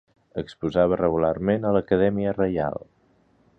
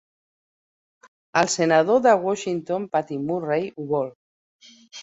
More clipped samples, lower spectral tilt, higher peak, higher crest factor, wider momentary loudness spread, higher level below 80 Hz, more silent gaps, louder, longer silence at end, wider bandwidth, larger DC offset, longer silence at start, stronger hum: neither; first, -9 dB/octave vs -4.5 dB/octave; second, -6 dBFS vs -2 dBFS; about the same, 18 dB vs 22 dB; first, 13 LU vs 9 LU; first, -48 dBFS vs -68 dBFS; second, none vs 4.15-4.59 s; about the same, -23 LUFS vs -22 LUFS; first, 0.8 s vs 0 s; about the same, 7.8 kHz vs 8.4 kHz; neither; second, 0.35 s vs 1.35 s; neither